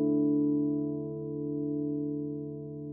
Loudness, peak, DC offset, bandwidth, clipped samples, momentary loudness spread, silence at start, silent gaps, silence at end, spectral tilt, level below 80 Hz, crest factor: -32 LUFS; -20 dBFS; under 0.1%; 1.2 kHz; under 0.1%; 11 LU; 0 s; none; 0 s; -16.5 dB/octave; -66 dBFS; 12 dB